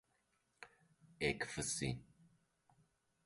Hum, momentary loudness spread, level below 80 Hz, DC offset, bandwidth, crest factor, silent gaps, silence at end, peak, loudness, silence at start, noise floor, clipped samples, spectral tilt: none; 21 LU; -66 dBFS; under 0.1%; 11.5 kHz; 24 dB; none; 1.25 s; -22 dBFS; -41 LUFS; 0.6 s; -81 dBFS; under 0.1%; -3.5 dB/octave